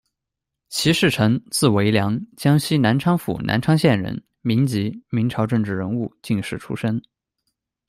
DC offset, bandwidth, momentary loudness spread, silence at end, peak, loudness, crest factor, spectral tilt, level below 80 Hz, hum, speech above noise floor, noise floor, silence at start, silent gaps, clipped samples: under 0.1%; 16 kHz; 9 LU; 0.9 s; -2 dBFS; -21 LUFS; 18 dB; -5.5 dB/octave; -52 dBFS; none; 64 dB; -83 dBFS; 0.7 s; none; under 0.1%